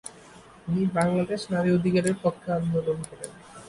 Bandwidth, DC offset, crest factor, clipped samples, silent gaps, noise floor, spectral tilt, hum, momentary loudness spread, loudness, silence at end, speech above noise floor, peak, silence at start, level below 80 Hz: 11.5 kHz; under 0.1%; 16 dB; under 0.1%; none; -50 dBFS; -6.5 dB/octave; none; 17 LU; -26 LUFS; 0 s; 24 dB; -10 dBFS; 0.05 s; -56 dBFS